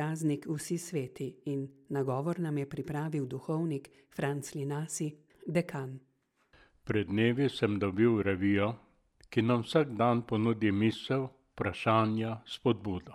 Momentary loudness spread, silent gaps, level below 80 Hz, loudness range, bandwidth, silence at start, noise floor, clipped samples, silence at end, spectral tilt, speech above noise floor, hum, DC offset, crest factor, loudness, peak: 11 LU; none; -66 dBFS; 6 LU; 15.5 kHz; 0 s; -68 dBFS; under 0.1%; 0 s; -6.5 dB/octave; 37 dB; none; under 0.1%; 20 dB; -32 LUFS; -12 dBFS